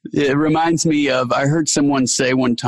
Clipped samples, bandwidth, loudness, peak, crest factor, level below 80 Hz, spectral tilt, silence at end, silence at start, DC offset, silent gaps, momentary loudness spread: under 0.1%; 12.5 kHz; -16 LUFS; -4 dBFS; 12 dB; -52 dBFS; -4.5 dB/octave; 0 s; 0.05 s; under 0.1%; none; 1 LU